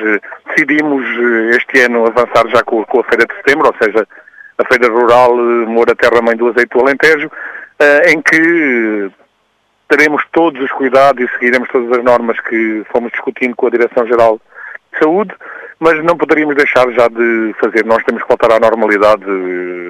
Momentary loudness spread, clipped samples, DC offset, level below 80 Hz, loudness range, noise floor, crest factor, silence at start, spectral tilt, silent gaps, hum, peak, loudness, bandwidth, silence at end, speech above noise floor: 9 LU; 0.2%; under 0.1%; -50 dBFS; 3 LU; -58 dBFS; 12 dB; 0 s; -5 dB/octave; none; none; 0 dBFS; -11 LUFS; 15.5 kHz; 0 s; 48 dB